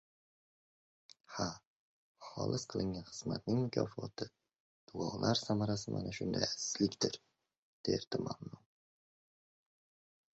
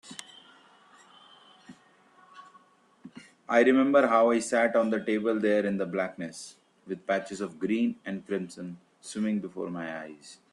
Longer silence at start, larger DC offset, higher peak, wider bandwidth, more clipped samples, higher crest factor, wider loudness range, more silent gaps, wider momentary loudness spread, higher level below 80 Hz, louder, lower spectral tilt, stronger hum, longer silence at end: first, 1.3 s vs 0.05 s; neither; second, -16 dBFS vs -8 dBFS; second, 8 kHz vs 12 kHz; neither; first, 26 dB vs 20 dB; about the same, 6 LU vs 8 LU; first, 1.67-2.15 s, 4.60-4.87 s, 7.58-7.84 s, 8.07-8.11 s vs none; second, 14 LU vs 22 LU; first, -66 dBFS vs -74 dBFS; second, -38 LUFS vs -27 LUFS; about the same, -5.5 dB/octave vs -5.5 dB/octave; neither; first, 1.8 s vs 0.2 s